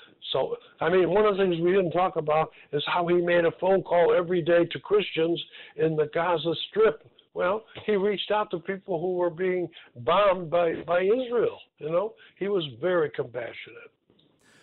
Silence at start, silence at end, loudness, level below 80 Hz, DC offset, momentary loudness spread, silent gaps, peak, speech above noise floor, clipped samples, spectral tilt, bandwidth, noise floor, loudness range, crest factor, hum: 0.2 s; 0.75 s; -26 LUFS; -62 dBFS; under 0.1%; 11 LU; none; -14 dBFS; 38 dB; under 0.1%; -9 dB/octave; 4.4 kHz; -64 dBFS; 4 LU; 12 dB; none